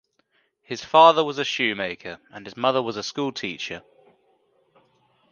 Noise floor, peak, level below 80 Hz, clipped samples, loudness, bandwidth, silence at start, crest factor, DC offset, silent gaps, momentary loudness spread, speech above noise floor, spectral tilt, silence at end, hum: -68 dBFS; -2 dBFS; -68 dBFS; under 0.1%; -22 LUFS; 7.2 kHz; 0.7 s; 22 dB; under 0.1%; none; 22 LU; 46 dB; -4 dB/octave; 1.5 s; none